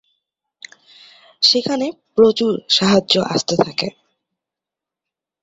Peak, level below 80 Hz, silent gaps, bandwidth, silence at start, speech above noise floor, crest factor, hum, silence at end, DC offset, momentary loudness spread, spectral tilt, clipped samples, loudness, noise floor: 0 dBFS; -58 dBFS; none; 8 kHz; 1.4 s; 70 dB; 20 dB; none; 1.55 s; under 0.1%; 9 LU; -4 dB/octave; under 0.1%; -16 LUFS; -86 dBFS